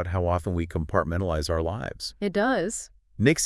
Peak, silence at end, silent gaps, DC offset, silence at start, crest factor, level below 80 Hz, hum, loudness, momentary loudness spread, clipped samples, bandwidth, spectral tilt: -6 dBFS; 0 s; none; under 0.1%; 0 s; 20 dB; -44 dBFS; none; -27 LUFS; 8 LU; under 0.1%; 12 kHz; -5 dB/octave